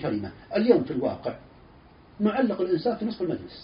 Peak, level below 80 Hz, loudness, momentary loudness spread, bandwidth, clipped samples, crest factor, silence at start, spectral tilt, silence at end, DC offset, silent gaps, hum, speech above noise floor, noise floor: -6 dBFS; -58 dBFS; -26 LUFS; 12 LU; 5.4 kHz; under 0.1%; 22 dB; 0 s; -6 dB/octave; 0 s; under 0.1%; none; none; 26 dB; -52 dBFS